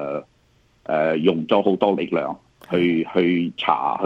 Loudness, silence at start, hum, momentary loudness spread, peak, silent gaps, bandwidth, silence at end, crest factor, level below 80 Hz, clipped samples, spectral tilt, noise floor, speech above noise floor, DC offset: -21 LUFS; 0 s; none; 11 LU; -2 dBFS; none; 7.4 kHz; 0 s; 20 dB; -62 dBFS; under 0.1%; -8 dB/octave; -59 dBFS; 39 dB; under 0.1%